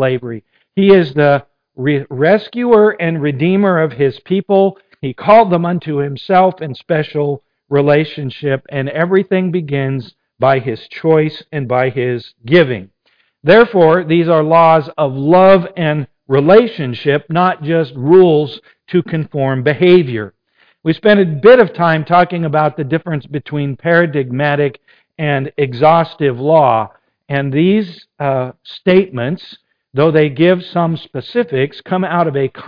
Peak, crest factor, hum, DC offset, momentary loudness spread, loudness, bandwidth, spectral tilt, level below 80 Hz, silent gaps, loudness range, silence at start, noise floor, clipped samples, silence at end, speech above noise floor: 0 dBFS; 12 dB; none; under 0.1%; 12 LU; -13 LUFS; 5.2 kHz; -9.5 dB/octave; -52 dBFS; none; 5 LU; 0 s; -59 dBFS; under 0.1%; 0 s; 47 dB